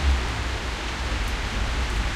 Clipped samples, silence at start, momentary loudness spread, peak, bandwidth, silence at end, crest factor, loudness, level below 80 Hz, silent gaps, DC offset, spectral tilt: under 0.1%; 0 s; 3 LU; -10 dBFS; 13 kHz; 0 s; 14 dB; -27 LUFS; -26 dBFS; none; under 0.1%; -4 dB/octave